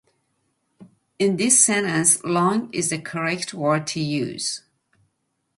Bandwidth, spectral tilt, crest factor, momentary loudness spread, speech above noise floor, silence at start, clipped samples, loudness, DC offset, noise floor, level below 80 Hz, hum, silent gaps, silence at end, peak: 12 kHz; -3 dB/octave; 22 dB; 11 LU; 52 dB; 0.8 s; under 0.1%; -20 LUFS; under 0.1%; -73 dBFS; -66 dBFS; none; none; 1 s; -2 dBFS